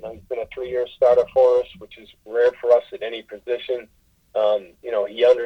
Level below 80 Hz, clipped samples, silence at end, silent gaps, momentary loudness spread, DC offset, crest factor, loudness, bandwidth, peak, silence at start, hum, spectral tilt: -58 dBFS; under 0.1%; 0 s; none; 14 LU; under 0.1%; 18 dB; -21 LUFS; 6 kHz; -4 dBFS; 0.05 s; none; -5 dB/octave